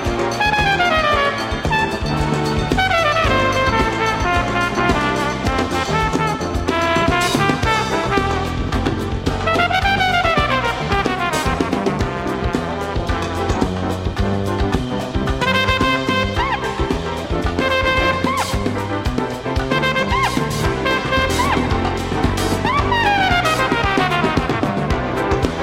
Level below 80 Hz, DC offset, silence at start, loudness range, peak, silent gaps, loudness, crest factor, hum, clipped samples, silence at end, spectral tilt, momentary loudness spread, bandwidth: -28 dBFS; under 0.1%; 0 s; 3 LU; 0 dBFS; none; -18 LUFS; 18 dB; none; under 0.1%; 0 s; -5 dB/octave; 6 LU; 16.5 kHz